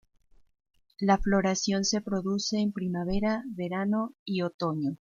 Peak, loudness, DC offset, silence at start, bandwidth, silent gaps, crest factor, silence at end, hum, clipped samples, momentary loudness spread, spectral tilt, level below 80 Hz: -10 dBFS; -29 LUFS; under 0.1%; 1 s; 7.4 kHz; 4.19-4.26 s, 4.54-4.59 s; 20 dB; 0.2 s; none; under 0.1%; 6 LU; -5 dB/octave; -48 dBFS